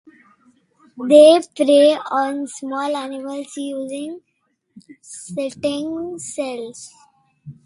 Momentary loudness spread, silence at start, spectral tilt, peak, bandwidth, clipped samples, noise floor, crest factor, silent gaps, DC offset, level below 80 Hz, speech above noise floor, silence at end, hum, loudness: 21 LU; 0.95 s; -4 dB/octave; 0 dBFS; 11.5 kHz; under 0.1%; -69 dBFS; 20 dB; none; under 0.1%; -66 dBFS; 51 dB; 0.15 s; none; -18 LUFS